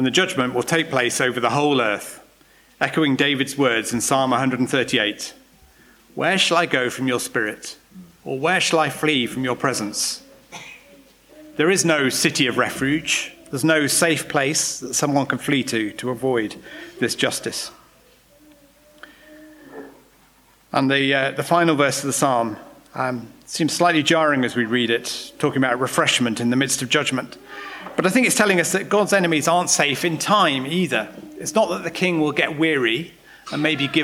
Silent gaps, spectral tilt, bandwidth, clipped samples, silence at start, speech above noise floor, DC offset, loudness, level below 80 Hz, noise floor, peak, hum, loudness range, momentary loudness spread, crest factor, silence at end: none; -3.5 dB/octave; 18 kHz; under 0.1%; 0 s; 35 dB; under 0.1%; -20 LUFS; -60 dBFS; -55 dBFS; -2 dBFS; none; 5 LU; 14 LU; 18 dB; 0 s